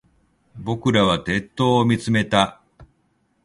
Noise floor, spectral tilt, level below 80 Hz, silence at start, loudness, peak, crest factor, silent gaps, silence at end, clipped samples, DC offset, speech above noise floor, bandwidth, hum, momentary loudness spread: -66 dBFS; -5.5 dB/octave; -48 dBFS; 0.55 s; -20 LUFS; 0 dBFS; 22 dB; none; 0.6 s; under 0.1%; under 0.1%; 47 dB; 11.5 kHz; none; 7 LU